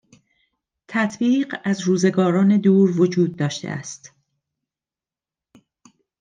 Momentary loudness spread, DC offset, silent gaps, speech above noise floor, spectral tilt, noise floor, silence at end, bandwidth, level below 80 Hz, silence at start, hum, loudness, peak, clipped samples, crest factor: 14 LU; under 0.1%; none; over 71 dB; -6.5 dB/octave; under -90 dBFS; 2.15 s; 9.4 kHz; -68 dBFS; 0.9 s; none; -19 LUFS; -6 dBFS; under 0.1%; 16 dB